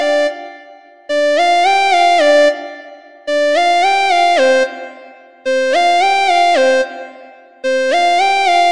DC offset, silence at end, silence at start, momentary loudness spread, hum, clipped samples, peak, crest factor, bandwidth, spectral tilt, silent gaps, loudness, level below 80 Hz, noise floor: 1%; 0 s; 0 s; 19 LU; none; under 0.1%; -2 dBFS; 12 dB; 11 kHz; -0.5 dB/octave; none; -12 LUFS; -64 dBFS; -40 dBFS